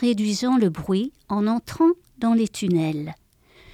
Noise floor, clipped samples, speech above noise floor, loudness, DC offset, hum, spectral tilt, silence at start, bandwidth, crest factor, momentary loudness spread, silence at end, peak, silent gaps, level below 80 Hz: -53 dBFS; under 0.1%; 31 dB; -23 LUFS; under 0.1%; none; -6 dB/octave; 0 s; 14.5 kHz; 14 dB; 7 LU; 0.6 s; -8 dBFS; none; -56 dBFS